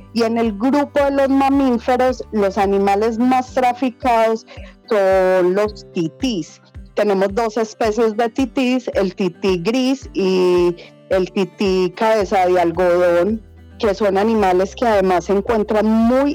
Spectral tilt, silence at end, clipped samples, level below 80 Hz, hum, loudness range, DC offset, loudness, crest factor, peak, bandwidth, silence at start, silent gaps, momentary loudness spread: -6 dB/octave; 0 s; under 0.1%; -42 dBFS; none; 2 LU; under 0.1%; -17 LUFS; 12 dB; -6 dBFS; 18 kHz; 0 s; none; 6 LU